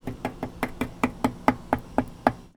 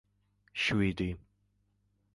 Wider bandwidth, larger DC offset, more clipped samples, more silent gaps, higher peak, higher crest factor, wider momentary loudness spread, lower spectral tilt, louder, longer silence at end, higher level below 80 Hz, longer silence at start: first, 19 kHz vs 11.5 kHz; neither; neither; neither; first, 0 dBFS vs -16 dBFS; first, 28 dB vs 20 dB; second, 9 LU vs 14 LU; about the same, -6.5 dB/octave vs -5.5 dB/octave; first, -28 LUFS vs -32 LUFS; second, 0.1 s vs 0.95 s; first, -44 dBFS vs -52 dBFS; second, 0.05 s vs 0.55 s